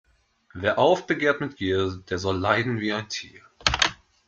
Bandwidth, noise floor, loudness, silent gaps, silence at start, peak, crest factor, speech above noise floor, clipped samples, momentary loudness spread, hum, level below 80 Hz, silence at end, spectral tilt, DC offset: 9 kHz; -62 dBFS; -24 LUFS; none; 0.55 s; -2 dBFS; 24 dB; 37 dB; under 0.1%; 10 LU; none; -48 dBFS; 0.35 s; -4 dB/octave; under 0.1%